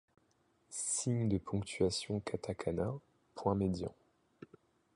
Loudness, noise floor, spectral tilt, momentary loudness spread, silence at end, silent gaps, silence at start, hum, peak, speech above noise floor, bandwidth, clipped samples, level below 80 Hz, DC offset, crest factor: -37 LUFS; -74 dBFS; -5 dB/octave; 10 LU; 0.5 s; none; 0.7 s; none; -18 dBFS; 39 dB; 11.5 kHz; under 0.1%; -58 dBFS; under 0.1%; 20 dB